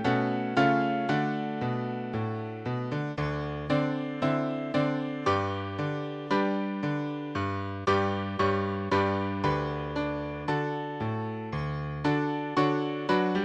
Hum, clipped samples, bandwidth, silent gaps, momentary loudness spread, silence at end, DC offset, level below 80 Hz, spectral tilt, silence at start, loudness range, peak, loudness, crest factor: none; under 0.1%; 9 kHz; none; 7 LU; 0 s; under 0.1%; -54 dBFS; -7.5 dB/octave; 0 s; 2 LU; -10 dBFS; -29 LUFS; 18 dB